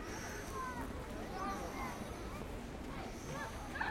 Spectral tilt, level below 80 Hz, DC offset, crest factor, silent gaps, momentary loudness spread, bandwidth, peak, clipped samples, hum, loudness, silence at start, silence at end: -4.5 dB/octave; -52 dBFS; under 0.1%; 18 dB; none; 4 LU; 16.5 kHz; -26 dBFS; under 0.1%; none; -44 LUFS; 0 s; 0 s